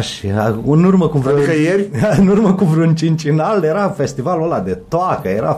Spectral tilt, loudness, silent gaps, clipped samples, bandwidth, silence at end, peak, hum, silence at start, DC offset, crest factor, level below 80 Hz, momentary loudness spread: -7.5 dB/octave; -14 LUFS; none; under 0.1%; 13 kHz; 0 s; -2 dBFS; none; 0 s; under 0.1%; 12 dB; -42 dBFS; 6 LU